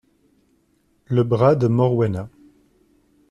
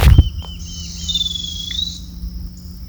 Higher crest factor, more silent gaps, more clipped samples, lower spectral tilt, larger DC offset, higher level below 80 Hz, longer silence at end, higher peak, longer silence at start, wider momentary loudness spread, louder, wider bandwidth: about the same, 18 dB vs 18 dB; neither; second, under 0.1% vs 0.2%; first, -9.5 dB/octave vs -4.5 dB/octave; neither; second, -54 dBFS vs -20 dBFS; first, 1.05 s vs 0 s; second, -4 dBFS vs 0 dBFS; first, 1.1 s vs 0 s; second, 12 LU vs 16 LU; about the same, -19 LUFS vs -20 LUFS; second, 7 kHz vs over 20 kHz